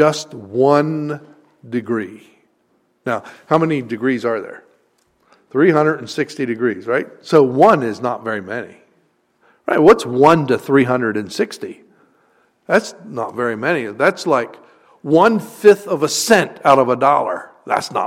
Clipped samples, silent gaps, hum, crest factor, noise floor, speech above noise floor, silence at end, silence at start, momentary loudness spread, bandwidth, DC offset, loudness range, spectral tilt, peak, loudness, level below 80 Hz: under 0.1%; none; none; 18 dB; -62 dBFS; 46 dB; 0 s; 0 s; 14 LU; 16 kHz; under 0.1%; 7 LU; -5 dB/octave; 0 dBFS; -16 LUFS; -58 dBFS